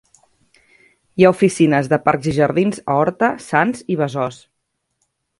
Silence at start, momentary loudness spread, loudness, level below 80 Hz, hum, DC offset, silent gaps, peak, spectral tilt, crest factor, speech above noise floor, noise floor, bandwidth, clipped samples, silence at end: 1.15 s; 7 LU; -17 LUFS; -54 dBFS; none; under 0.1%; none; 0 dBFS; -6.5 dB/octave; 18 dB; 56 dB; -72 dBFS; 11.5 kHz; under 0.1%; 1.05 s